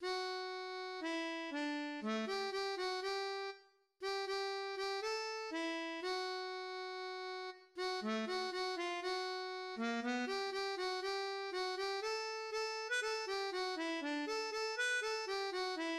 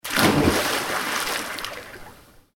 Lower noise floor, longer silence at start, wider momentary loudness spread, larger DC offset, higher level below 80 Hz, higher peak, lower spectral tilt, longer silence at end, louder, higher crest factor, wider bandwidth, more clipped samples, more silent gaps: first, -64 dBFS vs -48 dBFS; about the same, 0 s vs 0.05 s; second, 6 LU vs 19 LU; neither; second, -82 dBFS vs -44 dBFS; second, -28 dBFS vs 0 dBFS; second, -2 dB/octave vs -3.5 dB/octave; second, 0 s vs 0.4 s; second, -40 LUFS vs -22 LUFS; second, 14 dB vs 24 dB; second, 13 kHz vs 18 kHz; neither; neither